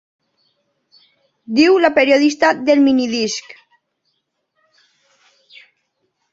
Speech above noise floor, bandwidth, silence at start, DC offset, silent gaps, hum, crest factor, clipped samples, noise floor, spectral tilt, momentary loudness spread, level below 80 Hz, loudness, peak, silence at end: 56 dB; 7.8 kHz; 1.5 s; under 0.1%; none; none; 18 dB; under 0.1%; -70 dBFS; -3.5 dB/octave; 9 LU; -64 dBFS; -14 LUFS; -2 dBFS; 2.95 s